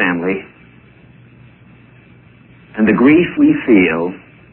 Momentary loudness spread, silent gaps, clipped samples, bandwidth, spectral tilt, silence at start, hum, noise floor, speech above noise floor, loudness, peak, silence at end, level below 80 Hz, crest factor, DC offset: 14 LU; none; under 0.1%; 3.5 kHz; -11 dB/octave; 0 s; none; -44 dBFS; 32 dB; -13 LUFS; 0 dBFS; 0.35 s; -50 dBFS; 16 dB; under 0.1%